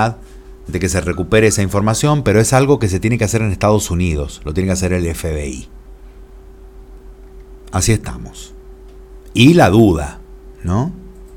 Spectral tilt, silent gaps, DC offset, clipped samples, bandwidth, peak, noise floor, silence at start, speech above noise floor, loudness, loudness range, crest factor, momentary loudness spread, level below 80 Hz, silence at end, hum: -5.5 dB/octave; none; under 0.1%; under 0.1%; 17 kHz; 0 dBFS; -38 dBFS; 0 s; 23 dB; -15 LUFS; 10 LU; 16 dB; 19 LU; -32 dBFS; 0 s; none